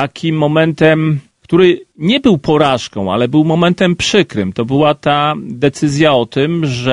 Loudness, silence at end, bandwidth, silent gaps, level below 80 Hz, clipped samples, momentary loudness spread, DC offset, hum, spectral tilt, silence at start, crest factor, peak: -13 LUFS; 0 s; 10.5 kHz; none; -46 dBFS; under 0.1%; 6 LU; under 0.1%; none; -6 dB/octave; 0 s; 12 dB; 0 dBFS